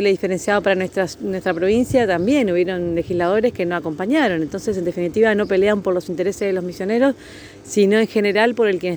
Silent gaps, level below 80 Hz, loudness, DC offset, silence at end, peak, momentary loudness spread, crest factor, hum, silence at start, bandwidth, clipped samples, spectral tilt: none; -50 dBFS; -19 LUFS; under 0.1%; 0 s; -2 dBFS; 7 LU; 16 dB; none; 0 s; over 20 kHz; under 0.1%; -5.5 dB/octave